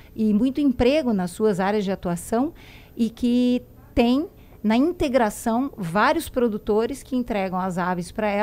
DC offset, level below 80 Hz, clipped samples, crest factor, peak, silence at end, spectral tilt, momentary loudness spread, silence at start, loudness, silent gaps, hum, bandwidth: under 0.1%; -44 dBFS; under 0.1%; 16 dB; -6 dBFS; 0 s; -6 dB/octave; 7 LU; 0.15 s; -23 LUFS; none; none; 16 kHz